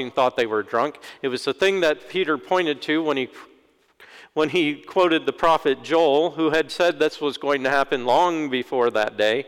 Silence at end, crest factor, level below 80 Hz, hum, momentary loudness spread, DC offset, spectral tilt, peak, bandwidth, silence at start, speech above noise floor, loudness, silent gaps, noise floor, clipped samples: 0 s; 14 dB; -58 dBFS; none; 6 LU; under 0.1%; -4.5 dB/octave; -8 dBFS; 16 kHz; 0 s; 37 dB; -22 LUFS; none; -58 dBFS; under 0.1%